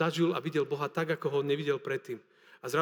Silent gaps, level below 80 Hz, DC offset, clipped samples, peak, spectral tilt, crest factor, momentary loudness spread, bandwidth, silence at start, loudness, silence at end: none; under -90 dBFS; under 0.1%; under 0.1%; -14 dBFS; -6 dB/octave; 18 dB; 12 LU; 20 kHz; 0 s; -32 LUFS; 0 s